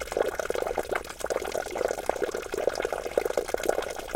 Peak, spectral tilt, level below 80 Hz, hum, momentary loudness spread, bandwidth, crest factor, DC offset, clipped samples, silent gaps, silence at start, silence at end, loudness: -6 dBFS; -3 dB/octave; -50 dBFS; none; 4 LU; 17 kHz; 24 dB; under 0.1%; under 0.1%; none; 0 s; 0 s; -30 LUFS